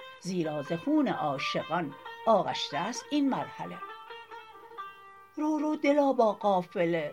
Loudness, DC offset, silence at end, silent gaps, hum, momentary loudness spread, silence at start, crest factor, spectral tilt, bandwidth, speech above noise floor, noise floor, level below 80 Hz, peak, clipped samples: -29 LUFS; under 0.1%; 0 s; none; none; 19 LU; 0 s; 18 dB; -5.5 dB/octave; 15.5 kHz; 22 dB; -51 dBFS; -80 dBFS; -12 dBFS; under 0.1%